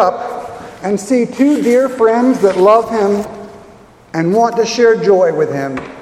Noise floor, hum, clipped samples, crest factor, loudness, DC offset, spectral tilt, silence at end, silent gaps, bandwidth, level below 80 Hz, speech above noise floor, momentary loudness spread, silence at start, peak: -40 dBFS; none; under 0.1%; 14 dB; -13 LUFS; under 0.1%; -5.5 dB/octave; 0 s; none; 14 kHz; -52 dBFS; 28 dB; 14 LU; 0 s; 0 dBFS